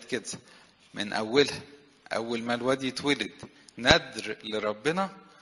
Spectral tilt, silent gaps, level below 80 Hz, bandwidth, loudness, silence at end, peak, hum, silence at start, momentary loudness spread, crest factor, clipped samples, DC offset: -3.5 dB/octave; none; -54 dBFS; 11.5 kHz; -28 LUFS; 0.2 s; 0 dBFS; none; 0 s; 17 LU; 30 dB; under 0.1%; under 0.1%